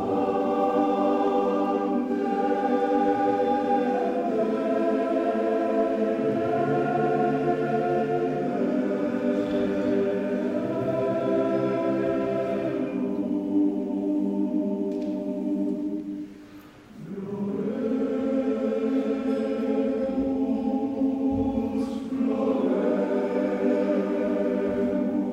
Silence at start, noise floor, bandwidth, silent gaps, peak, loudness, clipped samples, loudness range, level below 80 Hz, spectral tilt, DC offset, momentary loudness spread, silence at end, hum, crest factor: 0 s; -47 dBFS; 9 kHz; none; -12 dBFS; -25 LUFS; under 0.1%; 4 LU; -56 dBFS; -8 dB/octave; under 0.1%; 5 LU; 0 s; none; 12 dB